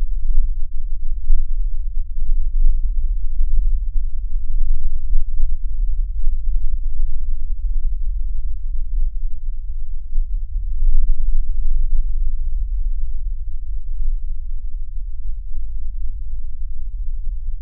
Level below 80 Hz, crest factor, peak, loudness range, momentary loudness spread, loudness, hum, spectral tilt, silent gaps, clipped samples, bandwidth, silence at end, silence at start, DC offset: -16 dBFS; 12 dB; 0 dBFS; 6 LU; 8 LU; -28 LUFS; none; -22.5 dB/octave; none; under 0.1%; 0.2 kHz; 0 s; 0 s; under 0.1%